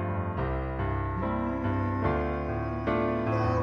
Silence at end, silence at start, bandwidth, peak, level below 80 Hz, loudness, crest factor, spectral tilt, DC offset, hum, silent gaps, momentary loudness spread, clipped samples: 0 s; 0 s; 6.4 kHz; -14 dBFS; -38 dBFS; -30 LUFS; 14 dB; -9.5 dB/octave; under 0.1%; none; none; 4 LU; under 0.1%